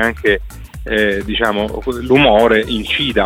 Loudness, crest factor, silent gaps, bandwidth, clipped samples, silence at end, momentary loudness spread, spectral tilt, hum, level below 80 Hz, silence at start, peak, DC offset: -14 LUFS; 14 dB; none; 16.5 kHz; under 0.1%; 0 s; 11 LU; -5.5 dB/octave; none; -30 dBFS; 0 s; 0 dBFS; under 0.1%